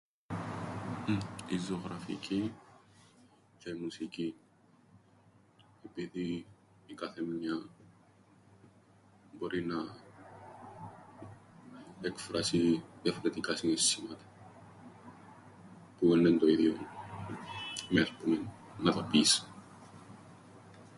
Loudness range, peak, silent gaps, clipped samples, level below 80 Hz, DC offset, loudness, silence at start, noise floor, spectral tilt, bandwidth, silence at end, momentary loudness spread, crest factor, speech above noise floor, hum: 13 LU; -12 dBFS; none; under 0.1%; -66 dBFS; under 0.1%; -33 LUFS; 0.3 s; -64 dBFS; -4 dB/octave; 11.5 kHz; 0 s; 27 LU; 22 dB; 32 dB; none